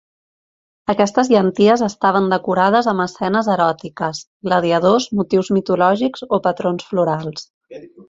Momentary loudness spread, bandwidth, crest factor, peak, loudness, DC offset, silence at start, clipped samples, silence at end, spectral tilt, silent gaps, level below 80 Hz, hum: 10 LU; 7.8 kHz; 16 dB; -2 dBFS; -17 LUFS; under 0.1%; 0.9 s; under 0.1%; 0.05 s; -6 dB/octave; 4.27-4.40 s, 7.50-7.61 s; -58 dBFS; none